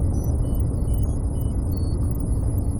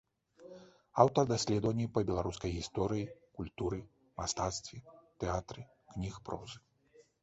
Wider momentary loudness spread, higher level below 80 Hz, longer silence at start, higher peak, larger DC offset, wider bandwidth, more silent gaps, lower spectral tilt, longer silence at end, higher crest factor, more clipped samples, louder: second, 2 LU vs 21 LU; first, -24 dBFS vs -54 dBFS; second, 0 s vs 0.4 s; about the same, -12 dBFS vs -10 dBFS; first, 0.3% vs under 0.1%; first, 19 kHz vs 8 kHz; neither; first, -8.5 dB/octave vs -6 dB/octave; second, 0 s vs 0.2 s; second, 10 dB vs 26 dB; neither; first, -25 LUFS vs -35 LUFS